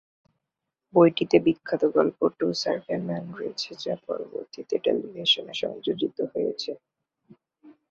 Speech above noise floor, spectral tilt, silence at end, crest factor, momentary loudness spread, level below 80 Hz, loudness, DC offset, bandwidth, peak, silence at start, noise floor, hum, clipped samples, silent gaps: 59 dB; -5.5 dB/octave; 0.2 s; 22 dB; 13 LU; -68 dBFS; -26 LUFS; under 0.1%; 7.6 kHz; -4 dBFS; 0.95 s; -85 dBFS; none; under 0.1%; none